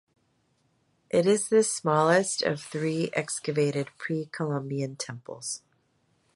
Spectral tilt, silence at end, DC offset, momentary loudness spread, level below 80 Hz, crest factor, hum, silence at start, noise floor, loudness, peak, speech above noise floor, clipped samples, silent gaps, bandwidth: -4.5 dB/octave; 0.8 s; under 0.1%; 13 LU; -72 dBFS; 20 dB; none; 1.15 s; -70 dBFS; -27 LUFS; -8 dBFS; 43 dB; under 0.1%; none; 11.5 kHz